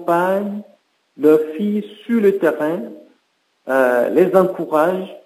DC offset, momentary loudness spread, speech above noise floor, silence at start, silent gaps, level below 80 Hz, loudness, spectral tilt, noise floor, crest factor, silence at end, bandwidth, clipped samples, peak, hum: under 0.1%; 12 LU; 48 dB; 0 s; none; -76 dBFS; -17 LUFS; -7.5 dB/octave; -65 dBFS; 18 dB; 0.1 s; 16 kHz; under 0.1%; 0 dBFS; none